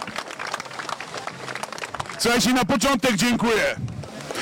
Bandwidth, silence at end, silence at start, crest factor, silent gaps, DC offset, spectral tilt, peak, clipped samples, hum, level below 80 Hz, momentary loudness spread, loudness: 17 kHz; 0 s; 0 s; 12 dB; none; under 0.1%; -3.5 dB/octave; -12 dBFS; under 0.1%; none; -50 dBFS; 13 LU; -23 LUFS